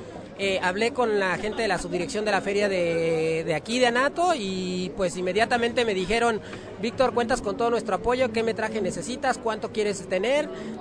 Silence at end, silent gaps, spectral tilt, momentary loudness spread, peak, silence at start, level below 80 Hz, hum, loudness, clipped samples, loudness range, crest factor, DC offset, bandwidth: 0 s; none; -4.5 dB/octave; 6 LU; -8 dBFS; 0 s; -50 dBFS; none; -25 LUFS; under 0.1%; 2 LU; 18 dB; under 0.1%; 10.5 kHz